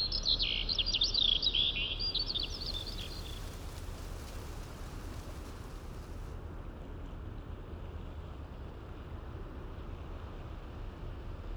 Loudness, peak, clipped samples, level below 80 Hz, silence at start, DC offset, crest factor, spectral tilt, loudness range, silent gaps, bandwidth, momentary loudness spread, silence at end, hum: -33 LUFS; -16 dBFS; under 0.1%; -44 dBFS; 0 s; under 0.1%; 20 dB; -3.5 dB/octave; 15 LU; none; over 20 kHz; 18 LU; 0 s; none